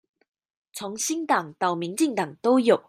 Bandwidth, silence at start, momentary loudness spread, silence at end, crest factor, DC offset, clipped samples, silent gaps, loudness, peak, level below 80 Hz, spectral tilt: 16 kHz; 0.75 s; 14 LU; 0.1 s; 18 dB; under 0.1%; under 0.1%; none; -25 LUFS; -6 dBFS; -76 dBFS; -4 dB/octave